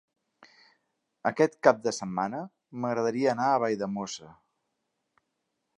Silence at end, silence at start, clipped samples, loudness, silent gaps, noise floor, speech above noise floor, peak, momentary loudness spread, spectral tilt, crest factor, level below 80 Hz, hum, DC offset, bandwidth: 1.45 s; 1.25 s; under 0.1%; -28 LUFS; none; -81 dBFS; 53 dB; -4 dBFS; 14 LU; -5 dB/octave; 26 dB; -74 dBFS; none; under 0.1%; 11 kHz